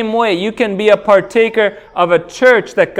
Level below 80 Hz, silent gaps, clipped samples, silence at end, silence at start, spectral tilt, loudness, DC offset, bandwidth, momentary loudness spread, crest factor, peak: -52 dBFS; none; 0.2%; 0 s; 0 s; -5 dB/octave; -12 LUFS; under 0.1%; 11.5 kHz; 6 LU; 12 dB; 0 dBFS